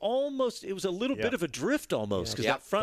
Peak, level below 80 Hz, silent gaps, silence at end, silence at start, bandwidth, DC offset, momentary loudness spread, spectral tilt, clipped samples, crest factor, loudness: -12 dBFS; -60 dBFS; none; 0 s; 0 s; 14.5 kHz; under 0.1%; 3 LU; -4.5 dB/octave; under 0.1%; 18 dB; -31 LUFS